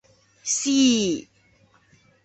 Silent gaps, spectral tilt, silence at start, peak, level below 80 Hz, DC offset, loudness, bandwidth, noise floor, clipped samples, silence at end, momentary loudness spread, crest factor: none; -2.5 dB/octave; 0.45 s; -8 dBFS; -64 dBFS; under 0.1%; -21 LUFS; 8.4 kHz; -59 dBFS; under 0.1%; 1.05 s; 13 LU; 16 dB